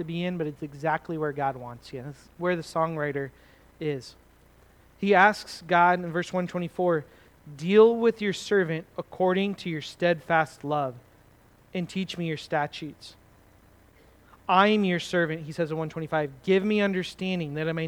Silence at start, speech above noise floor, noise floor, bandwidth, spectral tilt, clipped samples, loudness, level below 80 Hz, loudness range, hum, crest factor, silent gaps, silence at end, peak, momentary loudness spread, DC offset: 0 s; 31 dB; -57 dBFS; 19 kHz; -6 dB/octave; under 0.1%; -26 LUFS; -62 dBFS; 8 LU; none; 22 dB; none; 0 s; -4 dBFS; 15 LU; under 0.1%